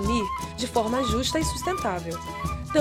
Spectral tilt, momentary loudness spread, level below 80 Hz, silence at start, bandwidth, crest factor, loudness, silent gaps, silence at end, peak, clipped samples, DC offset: -4.5 dB/octave; 7 LU; -38 dBFS; 0 s; 17 kHz; 18 dB; -27 LUFS; none; 0 s; -8 dBFS; under 0.1%; under 0.1%